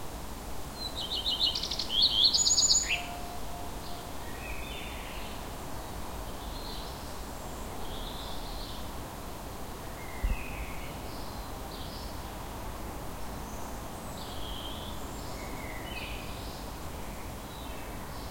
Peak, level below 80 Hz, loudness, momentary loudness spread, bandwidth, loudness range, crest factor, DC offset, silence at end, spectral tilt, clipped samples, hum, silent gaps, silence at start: -10 dBFS; -44 dBFS; -33 LUFS; 16 LU; 16.5 kHz; 14 LU; 24 dB; 0.3%; 0 s; -1.5 dB/octave; under 0.1%; none; none; 0 s